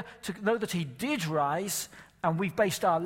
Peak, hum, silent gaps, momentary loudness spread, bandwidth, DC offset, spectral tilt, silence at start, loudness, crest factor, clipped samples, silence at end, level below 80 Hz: -12 dBFS; none; none; 6 LU; 16.5 kHz; under 0.1%; -4.5 dB/octave; 0 s; -30 LUFS; 18 dB; under 0.1%; 0 s; -66 dBFS